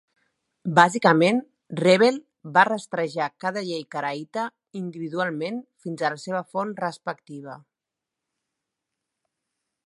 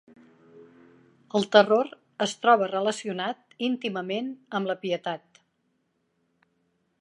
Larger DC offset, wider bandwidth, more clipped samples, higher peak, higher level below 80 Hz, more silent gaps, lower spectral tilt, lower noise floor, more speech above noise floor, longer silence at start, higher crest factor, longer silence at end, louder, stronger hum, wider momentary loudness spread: neither; about the same, 11.5 kHz vs 11.5 kHz; neither; about the same, -2 dBFS vs -2 dBFS; first, -76 dBFS vs -82 dBFS; neither; about the same, -5.5 dB/octave vs -4.5 dB/octave; first, -87 dBFS vs -73 dBFS; first, 63 dB vs 48 dB; about the same, 0.65 s vs 0.55 s; about the same, 24 dB vs 26 dB; first, 2.3 s vs 1.85 s; first, -23 LUFS vs -26 LUFS; neither; first, 17 LU vs 12 LU